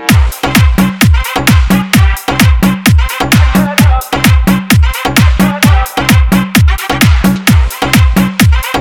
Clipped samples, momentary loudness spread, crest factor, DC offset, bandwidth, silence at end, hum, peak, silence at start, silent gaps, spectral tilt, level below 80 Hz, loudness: 0.8%; 2 LU; 8 dB; 0.5%; over 20 kHz; 0 s; none; 0 dBFS; 0 s; none; -5 dB/octave; -12 dBFS; -9 LUFS